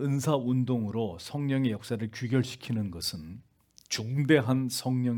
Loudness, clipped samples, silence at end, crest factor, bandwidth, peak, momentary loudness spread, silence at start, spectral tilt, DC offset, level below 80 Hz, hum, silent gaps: -29 LUFS; under 0.1%; 0 s; 20 dB; 18 kHz; -8 dBFS; 10 LU; 0 s; -6 dB/octave; under 0.1%; -66 dBFS; none; none